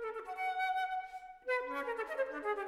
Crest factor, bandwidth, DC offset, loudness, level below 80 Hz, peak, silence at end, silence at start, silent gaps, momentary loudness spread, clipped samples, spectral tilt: 16 dB; 16 kHz; under 0.1%; -38 LUFS; -72 dBFS; -22 dBFS; 0 s; 0 s; none; 7 LU; under 0.1%; -2 dB/octave